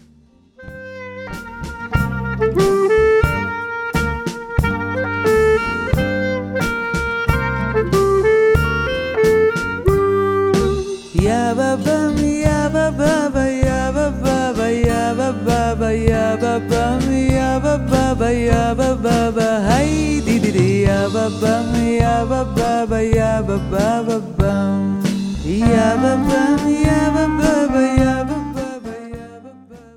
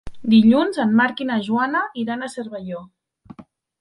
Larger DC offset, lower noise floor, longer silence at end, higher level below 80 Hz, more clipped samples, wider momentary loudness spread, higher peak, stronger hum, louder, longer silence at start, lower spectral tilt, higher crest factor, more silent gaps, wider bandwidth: neither; first, -50 dBFS vs -44 dBFS; second, 0.15 s vs 0.4 s; first, -28 dBFS vs -52 dBFS; neither; second, 8 LU vs 17 LU; first, 0 dBFS vs -4 dBFS; neither; about the same, -17 LUFS vs -19 LUFS; first, 0.6 s vs 0.05 s; about the same, -6.5 dB/octave vs -6.5 dB/octave; about the same, 16 dB vs 16 dB; neither; first, 17 kHz vs 10.5 kHz